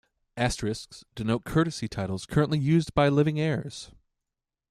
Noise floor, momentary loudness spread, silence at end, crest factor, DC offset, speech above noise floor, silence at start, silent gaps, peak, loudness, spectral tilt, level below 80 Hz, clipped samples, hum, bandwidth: -87 dBFS; 17 LU; 0.85 s; 18 dB; under 0.1%; 61 dB; 0.35 s; none; -8 dBFS; -27 LUFS; -6.5 dB/octave; -48 dBFS; under 0.1%; none; 13 kHz